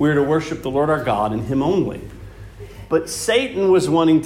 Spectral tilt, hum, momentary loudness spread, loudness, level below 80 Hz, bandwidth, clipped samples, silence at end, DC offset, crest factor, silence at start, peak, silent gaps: -5.5 dB/octave; none; 22 LU; -19 LUFS; -44 dBFS; 16 kHz; under 0.1%; 0 s; under 0.1%; 14 dB; 0 s; -6 dBFS; none